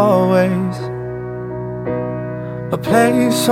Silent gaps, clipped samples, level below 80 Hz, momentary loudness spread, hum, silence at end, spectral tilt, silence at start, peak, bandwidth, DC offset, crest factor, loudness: none; under 0.1%; -46 dBFS; 13 LU; 60 Hz at -50 dBFS; 0 s; -6 dB/octave; 0 s; -2 dBFS; 17.5 kHz; under 0.1%; 16 dB; -18 LUFS